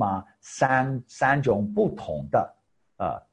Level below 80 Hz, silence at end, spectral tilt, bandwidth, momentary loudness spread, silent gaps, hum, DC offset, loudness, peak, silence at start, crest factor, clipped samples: -54 dBFS; 0.15 s; -6.5 dB/octave; 10.5 kHz; 11 LU; none; none; under 0.1%; -25 LUFS; -8 dBFS; 0 s; 18 dB; under 0.1%